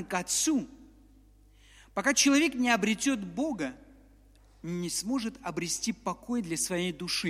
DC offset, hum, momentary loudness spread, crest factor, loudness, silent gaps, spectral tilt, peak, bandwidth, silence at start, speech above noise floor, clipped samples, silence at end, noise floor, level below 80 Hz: under 0.1%; 50 Hz at -60 dBFS; 13 LU; 20 dB; -29 LUFS; none; -3 dB/octave; -10 dBFS; 16 kHz; 0 s; 29 dB; under 0.1%; 0 s; -58 dBFS; -60 dBFS